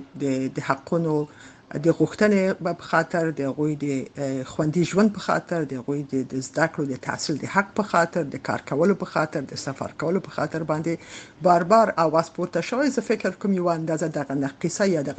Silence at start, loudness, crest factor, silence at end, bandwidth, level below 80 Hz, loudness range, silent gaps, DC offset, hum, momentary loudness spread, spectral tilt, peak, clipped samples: 0 s; -24 LUFS; 20 dB; 0 s; 9.2 kHz; -62 dBFS; 3 LU; none; under 0.1%; none; 9 LU; -6 dB/octave; -4 dBFS; under 0.1%